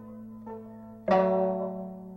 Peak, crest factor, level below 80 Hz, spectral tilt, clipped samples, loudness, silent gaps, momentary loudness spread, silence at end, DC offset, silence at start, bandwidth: -12 dBFS; 18 dB; -62 dBFS; -9 dB/octave; under 0.1%; -28 LUFS; none; 20 LU; 0 s; under 0.1%; 0 s; 6.2 kHz